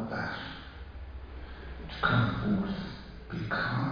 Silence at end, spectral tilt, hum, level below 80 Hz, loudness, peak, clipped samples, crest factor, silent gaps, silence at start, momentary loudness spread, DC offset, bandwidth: 0 s; -8 dB/octave; none; -46 dBFS; -32 LUFS; -12 dBFS; under 0.1%; 20 dB; none; 0 s; 18 LU; under 0.1%; 5.2 kHz